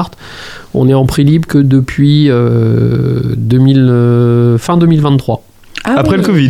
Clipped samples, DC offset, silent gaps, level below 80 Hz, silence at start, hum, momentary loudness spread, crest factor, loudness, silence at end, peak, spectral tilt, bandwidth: under 0.1%; under 0.1%; none; -34 dBFS; 0 s; none; 13 LU; 10 dB; -10 LUFS; 0 s; 0 dBFS; -8 dB/octave; 14 kHz